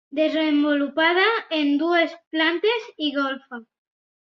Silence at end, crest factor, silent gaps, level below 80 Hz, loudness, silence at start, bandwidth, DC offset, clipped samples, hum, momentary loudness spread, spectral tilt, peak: 0.6 s; 18 dB; 2.27-2.31 s; -74 dBFS; -21 LUFS; 0.1 s; 6.2 kHz; under 0.1%; under 0.1%; none; 8 LU; -4 dB/octave; -6 dBFS